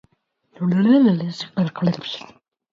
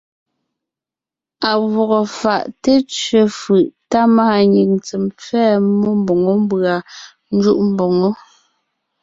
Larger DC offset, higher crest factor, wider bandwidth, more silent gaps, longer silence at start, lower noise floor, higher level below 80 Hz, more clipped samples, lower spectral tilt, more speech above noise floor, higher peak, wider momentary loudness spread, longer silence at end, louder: neither; about the same, 16 dB vs 14 dB; about the same, 7.4 kHz vs 7.8 kHz; neither; second, 0.6 s vs 1.4 s; second, -66 dBFS vs -88 dBFS; second, -66 dBFS vs -56 dBFS; neither; first, -8 dB/octave vs -6 dB/octave; second, 47 dB vs 73 dB; second, -6 dBFS vs -2 dBFS; first, 14 LU vs 9 LU; second, 0.5 s vs 0.85 s; second, -19 LUFS vs -15 LUFS